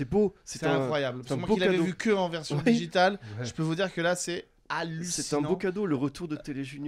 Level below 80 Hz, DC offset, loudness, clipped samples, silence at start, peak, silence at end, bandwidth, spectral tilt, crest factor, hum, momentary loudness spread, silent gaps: -56 dBFS; under 0.1%; -29 LUFS; under 0.1%; 0 s; -10 dBFS; 0 s; 14.5 kHz; -5 dB/octave; 18 dB; none; 10 LU; none